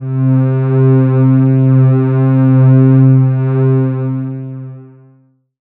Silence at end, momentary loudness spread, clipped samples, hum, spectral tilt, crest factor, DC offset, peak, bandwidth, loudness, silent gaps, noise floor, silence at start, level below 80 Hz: 0.8 s; 13 LU; under 0.1%; none; -15 dB/octave; 10 dB; under 0.1%; 0 dBFS; 2.8 kHz; -10 LUFS; none; -50 dBFS; 0 s; -64 dBFS